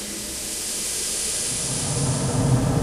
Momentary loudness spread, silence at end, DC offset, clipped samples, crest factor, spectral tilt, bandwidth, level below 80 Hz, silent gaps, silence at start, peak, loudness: 6 LU; 0 s; under 0.1%; under 0.1%; 16 dB; -3.5 dB/octave; 16 kHz; -40 dBFS; none; 0 s; -8 dBFS; -23 LUFS